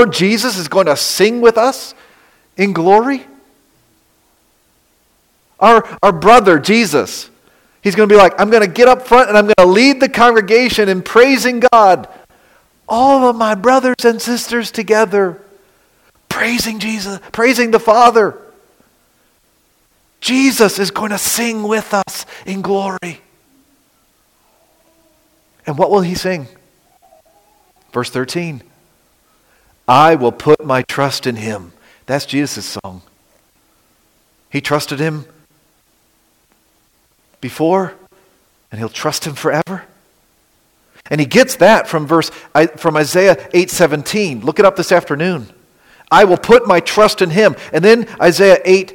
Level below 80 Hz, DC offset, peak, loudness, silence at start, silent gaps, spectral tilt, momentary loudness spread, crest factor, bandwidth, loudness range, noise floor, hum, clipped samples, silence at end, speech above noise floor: -48 dBFS; under 0.1%; 0 dBFS; -12 LUFS; 0 s; none; -4.5 dB/octave; 15 LU; 14 dB; 17 kHz; 14 LU; -57 dBFS; none; under 0.1%; 0 s; 45 dB